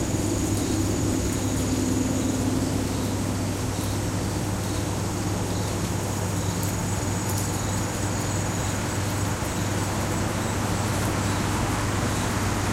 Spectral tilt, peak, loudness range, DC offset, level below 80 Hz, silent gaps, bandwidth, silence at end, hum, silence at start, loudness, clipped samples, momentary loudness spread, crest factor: -5 dB/octave; -12 dBFS; 2 LU; under 0.1%; -38 dBFS; none; 16 kHz; 0 s; none; 0 s; -26 LUFS; under 0.1%; 2 LU; 14 dB